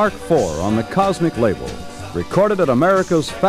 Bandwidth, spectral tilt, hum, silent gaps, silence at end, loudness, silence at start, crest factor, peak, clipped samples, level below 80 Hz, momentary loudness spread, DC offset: 15.5 kHz; -6 dB/octave; none; none; 0 s; -18 LUFS; 0 s; 14 dB; -2 dBFS; under 0.1%; -40 dBFS; 12 LU; under 0.1%